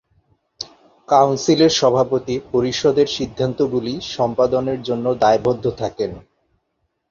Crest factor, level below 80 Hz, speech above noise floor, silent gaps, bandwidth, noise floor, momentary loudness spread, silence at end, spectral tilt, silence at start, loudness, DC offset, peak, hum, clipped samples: 18 dB; -50 dBFS; 54 dB; none; 7.4 kHz; -71 dBFS; 11 LU; 0.9 s; -5 dB/octave; 0.6 s; -18 LUFS; under 0.1%; -2 dBFS; none; under 0.1%